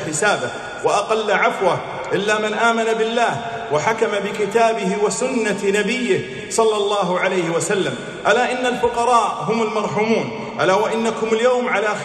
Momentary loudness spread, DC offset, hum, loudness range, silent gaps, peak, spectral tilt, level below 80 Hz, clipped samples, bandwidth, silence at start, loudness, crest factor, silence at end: 5 LU; under 0.1%; none; 1 LU; none; -4 dBFS; -4 dB/octave; -56 dBFS; under 0.1%; 12.5 kHz; 0 s; -19 LUFS; 16 dB; 0 s